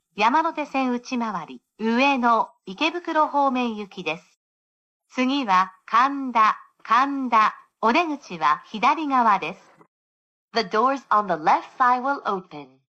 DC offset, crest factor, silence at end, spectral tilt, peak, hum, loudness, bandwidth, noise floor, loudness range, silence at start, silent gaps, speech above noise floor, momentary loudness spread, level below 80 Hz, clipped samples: under 0.1%; 16 dB; 0.35 s; -4.5 dB/octave; -8 dBFS; none; -22 LUFS; 8.2 kHz; under -90 dBFS; 3 LU; 0.15 s; 4.37-5.00 s, 9.88-10.48 s; over 68 dB; 10 LU; -72 dBFS; under 0.1%